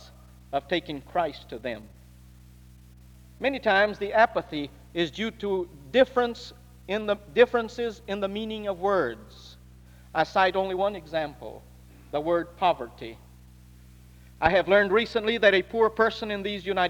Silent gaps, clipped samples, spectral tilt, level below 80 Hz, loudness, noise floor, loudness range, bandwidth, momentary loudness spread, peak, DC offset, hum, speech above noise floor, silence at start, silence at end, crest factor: none; under 0.1%; -5.5 dB/octave; -52 dBFS; -26 LUFS; -50 dBFS; 6 LU; 19.5 kHz; 14 LU; -6 dBFS; under 0.1%; none; 25 dB; 0 s; 0 s; 22 dB